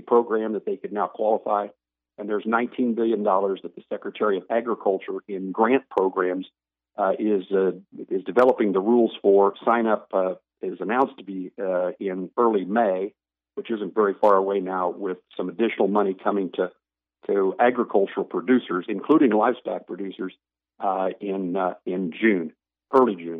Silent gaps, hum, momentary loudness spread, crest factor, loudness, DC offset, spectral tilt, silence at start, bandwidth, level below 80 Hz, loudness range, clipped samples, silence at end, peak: none; none; 13 LU; 18 dB; -23 LUFS; under 0.1%; -8.5 dB/octave; 0.05 s; 4.2 kHz; -78 dBFS; 4 LU; under 0.1%; 0 s; -6 dBFS